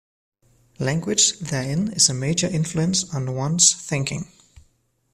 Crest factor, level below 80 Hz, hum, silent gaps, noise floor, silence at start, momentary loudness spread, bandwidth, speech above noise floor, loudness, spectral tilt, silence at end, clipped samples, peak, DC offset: 22 dB; -54 dBFS; none; none; -65 dBFS; 0.8 s; 11 LU; 14 kHz; 43 dB; -20 LUFS; -3 dB/octave; 0.85 s; under 0.1%; 0 dBFS; under 0.1%